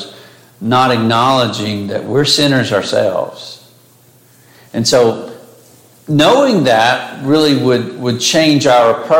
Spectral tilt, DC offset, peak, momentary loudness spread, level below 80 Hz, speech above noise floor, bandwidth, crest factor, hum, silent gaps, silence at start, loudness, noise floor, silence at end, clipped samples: -4.5 dB/octave; under 0.1%; 0 dBFS; 14 LU; -54 dBFS; 35 dB; 17 kHz; 12 dB; none; none; 0 s; -12 LUFS; -47 dBFS; 0 s; under 0.1%